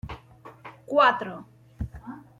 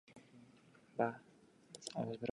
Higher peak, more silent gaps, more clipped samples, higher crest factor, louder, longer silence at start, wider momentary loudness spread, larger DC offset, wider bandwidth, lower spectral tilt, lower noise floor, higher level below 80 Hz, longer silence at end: first, -8 dBFS vs -22 dBFS; neither; neither; about the same, 22 dB vs 24 dB; first, -22 LUFS vs -43 LUFS; about the same, 0.05 s vs 0.1 s; about the same, 25 LU vs 23 LU; neither; about the same, 10 kHz vs 11 kHz; about the same, -6 dB/octave vs -5 dB/octave; second, -49 dBFS vs -66 dBFS; first, -48 dBFS vs -80 dBFS; first, 0.2 s vs 0.05 s